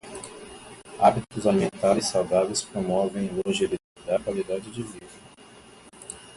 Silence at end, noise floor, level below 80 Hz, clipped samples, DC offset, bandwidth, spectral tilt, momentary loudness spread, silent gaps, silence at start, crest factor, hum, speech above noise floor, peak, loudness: 0 s; -50 dBFS; -56 dBFS; under 0.1%; under 0.1%; 11.5 kHz; -4.5 dB/octave; 21 LU; 3.84-3.96 s; 0.05 s; 20 dB; none; 25 dB; -6 dBFS; -25 LUFS